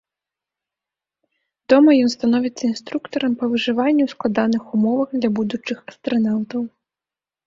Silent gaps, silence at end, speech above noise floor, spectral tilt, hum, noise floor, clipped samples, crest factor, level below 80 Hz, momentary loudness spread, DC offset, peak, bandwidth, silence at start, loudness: none; 0.8 s; 71 dB; -6 dB/octave; none; -90 dBFS; under 0.1%; 18 dB; -62 dBFS; 13 LU; under 0.1%; -2 dBFS; 7.6 kHz; 1.7 s; -19 LUFS